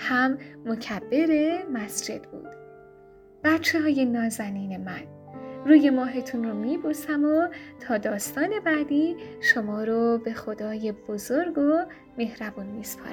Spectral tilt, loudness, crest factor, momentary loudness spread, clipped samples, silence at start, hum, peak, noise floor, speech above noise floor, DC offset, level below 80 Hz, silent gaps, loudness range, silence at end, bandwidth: -4.5 dB/octave; -25 LUFS; 20 dB; 13 LU; under 0.1%; 0 s; none; -6 dBFS; -51 dBFS; 26 dB; under 0.1%; -64 dBFS; none; 4 LU; 0 s; 19 kHz